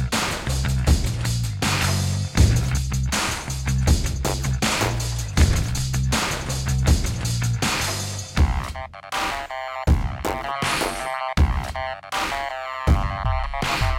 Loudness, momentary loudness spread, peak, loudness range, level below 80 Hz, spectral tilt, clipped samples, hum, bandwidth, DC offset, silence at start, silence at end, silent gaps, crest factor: -23 LUFS; 7 LU; -4 dBFS; 3 LU; -26 dBFS; -4.5 dB/octave; under 0.1%; none; 16.5 kHz; under 0.1%; 0 s; 0 s; none; 18 dB